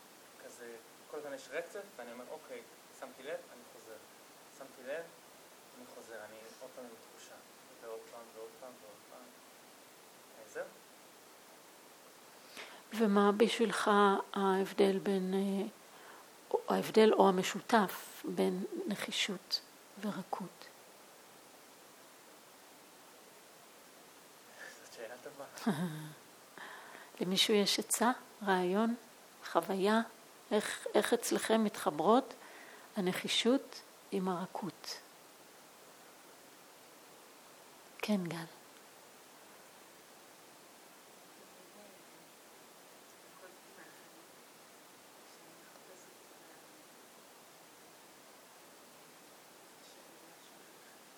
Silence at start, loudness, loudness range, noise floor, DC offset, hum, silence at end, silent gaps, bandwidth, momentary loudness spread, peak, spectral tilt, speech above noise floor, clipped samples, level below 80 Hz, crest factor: 0.4 s; -34 LUFS; 24 LU; -58 dBFS; under 0.1%; none; 0.25 s; none; over 20 kHz; 26 LU; -12 dBFS; -4 dB/octave; 24 dB; under 0.1%; -88 dBFS; 26 dB